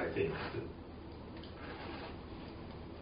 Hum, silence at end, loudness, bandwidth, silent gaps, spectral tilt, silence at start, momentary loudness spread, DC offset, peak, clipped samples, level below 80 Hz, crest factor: none; 0 s; -44 LUFS; 5 kHz; none; -5 dB/octave; 0 s; 12 LU; under 0.1%; -22 dBFS; under 0.1%; -56 dBFS; 20 dB